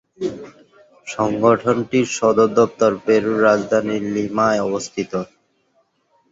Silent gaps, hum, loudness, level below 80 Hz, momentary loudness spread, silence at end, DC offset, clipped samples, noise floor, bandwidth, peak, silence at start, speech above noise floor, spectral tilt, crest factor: none; none; -18 LUFS; -56 dBFS; 12 LU; 1.05 s; under 0.1%; under 0.1%; -63 dBFS; 7.8 kHz; -2 dBFS; 0.2 s; 46 dB; -5.5 dB/octave; 18 dB